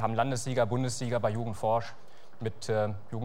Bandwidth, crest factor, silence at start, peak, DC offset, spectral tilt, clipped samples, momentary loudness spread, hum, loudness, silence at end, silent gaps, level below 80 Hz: 16 kHz; 18 dB; 0 s; -12 dBFS; 1%; -5.5 dB/octave; under 0.1%; 9 LU; none; -31 LUFS; 0 s; none; -64 dBFS